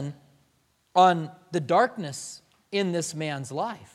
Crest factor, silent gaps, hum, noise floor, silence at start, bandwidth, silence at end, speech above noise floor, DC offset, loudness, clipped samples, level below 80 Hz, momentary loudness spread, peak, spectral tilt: 22 dB; none; none; -68 dBFS; 0 s; 14 kHz; 0.1 s; 43 dB; under 0.1%; -26 LUFS; under 0.1%; -74 dBFS; 17 LU; -6 dBFS; -4.5 dB/octave